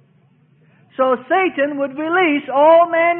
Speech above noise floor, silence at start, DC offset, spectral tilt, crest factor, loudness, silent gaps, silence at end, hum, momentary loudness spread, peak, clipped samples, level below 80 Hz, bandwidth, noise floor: 40 dB; 1 s; under 0.1%; -9.5 dB/octave; 16 dB; -15 LUFS; none; 0 s; none; 9 LU; -2 dBFS; under 0.1%; -68 dBFS; 3.7 kHz; -54 dBFS